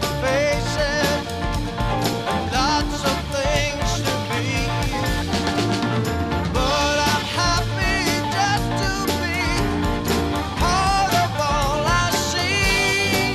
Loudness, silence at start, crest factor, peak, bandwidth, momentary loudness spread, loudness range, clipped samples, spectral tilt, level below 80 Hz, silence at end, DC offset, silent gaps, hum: -21 LUFS; 0 s; 14 dB; -6 dBFS; 15.5 kHz; 4 LU; 2 LU; under 0.1%; -4 dB/octave; -30 dBFS; 0 s; 0.1%; none; none